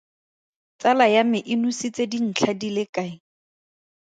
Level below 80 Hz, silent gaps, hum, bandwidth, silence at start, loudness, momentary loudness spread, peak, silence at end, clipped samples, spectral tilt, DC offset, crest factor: -72 dBFS; 2.89-2.93 s; none; 9.2 kHz; 0.8 s; -22 LUFS; 11 LU; -4 dBFS; 0.95 s; under 0.1%; -4.5 dB/octave; under 0.1%; 20 dB